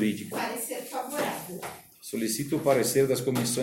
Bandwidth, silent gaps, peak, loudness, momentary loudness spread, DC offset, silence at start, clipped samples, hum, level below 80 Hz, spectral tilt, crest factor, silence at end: 16.5 kHz; none; -10 dBFS; -28 LUFS; 14 LU; under 0.1%; 0 s; under 0.1%; none; -66 dBFS; -4 dB/octave; 18 dB; 0 s